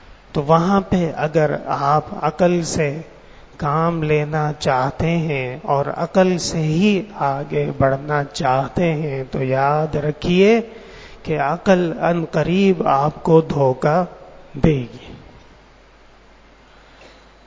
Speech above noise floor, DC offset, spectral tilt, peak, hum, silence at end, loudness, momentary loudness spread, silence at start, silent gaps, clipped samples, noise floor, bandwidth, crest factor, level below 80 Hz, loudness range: 30 dB; under 0.1%; -6.5 dB/octave; 0 dBFS; none; 2.25 s; -18 LUFS; 8 LU; 0.1 s; none; under 0.1%; -47 dBFS; 8 kHz; 18 dB; -42 dBFS; 3 LU